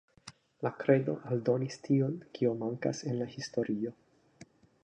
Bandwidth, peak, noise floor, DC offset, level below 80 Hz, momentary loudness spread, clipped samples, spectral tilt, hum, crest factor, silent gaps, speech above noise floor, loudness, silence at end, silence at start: 9.8 kHz; -12 dBFS; -58 dBFS; under 0.1%; -76 dBFS; 10 LU; under 0.1%; -7 dB/octave; none; 22 dB; none; 27 dB; -33 LUFS; 0.4 s; 0.25 s